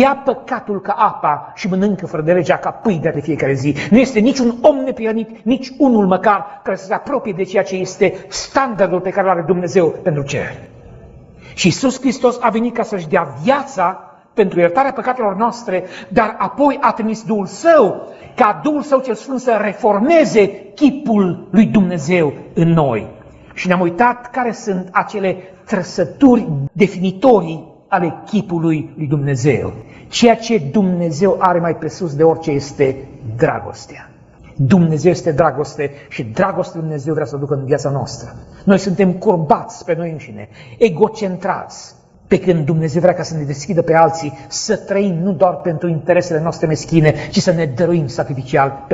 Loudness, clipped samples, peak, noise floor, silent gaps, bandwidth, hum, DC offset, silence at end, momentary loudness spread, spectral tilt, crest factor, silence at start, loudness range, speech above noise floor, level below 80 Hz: -16 LUFS; under 0.1%; 0 dBFS; -42 dBFS; none; 8 kHz; none; under 0.1%; 0 s; 10 LU; -6.5 dB/octave; 16 dB; 0 s; 3 LU; 26 dB; -48 dBFS